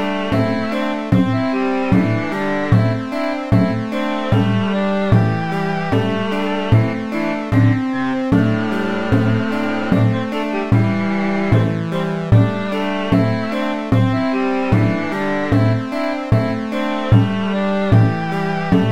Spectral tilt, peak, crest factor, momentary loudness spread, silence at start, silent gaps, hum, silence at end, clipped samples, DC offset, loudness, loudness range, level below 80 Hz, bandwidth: -8 dB/octave; 0 dBFS; 16 dB; 6 LU; 0 s; none; none; 0 s; under 0.1%; 2%; -18 LUFS; 1 LU; -38 dBFS; 8.8 kHz